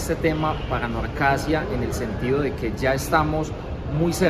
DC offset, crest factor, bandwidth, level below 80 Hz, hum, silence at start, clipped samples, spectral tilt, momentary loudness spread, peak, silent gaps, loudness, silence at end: under 0.1%; 18 dB; 15 kHz; -34 dBFS; none; 0 s; under 0.1%; -6 dB/octave; 6 LU; -6 dBFS; none; -24 LUFS; 0 s